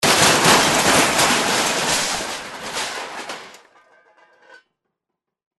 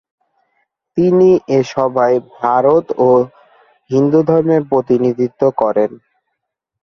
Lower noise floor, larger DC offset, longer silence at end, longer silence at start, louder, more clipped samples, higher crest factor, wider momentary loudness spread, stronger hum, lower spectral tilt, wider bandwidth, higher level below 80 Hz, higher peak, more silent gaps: first, -82 dBFS vs -76 dBFS; neither; first, 2.05 s vs 0.9 s; second, 0 s vs 0.95 s; about the same, -16 LUFS vs -14 LUFS; neither; about the same, 18 dB vs 14 dB; first, 17 LU vs 6 LU; neither; second, -1.5 dB/octave vs -8.5 dB/octave; first, 12.5 kHz vs 6.8 kHz; first, -50 dBFS vs -56 dBFS; about the same, -2 dBFS vs 0 dBFS; neither